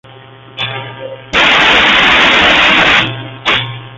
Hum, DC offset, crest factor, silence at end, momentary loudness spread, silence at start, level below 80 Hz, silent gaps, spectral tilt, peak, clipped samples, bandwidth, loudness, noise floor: none; under 0.1%; 12 dB; 0 s; 14 LU; 0.55 s; -36 dBFS; none; -3 dB/octave; 0 dBFS; under 0.1%; 13.5 kHz; -7 LUFS; -35 dBFS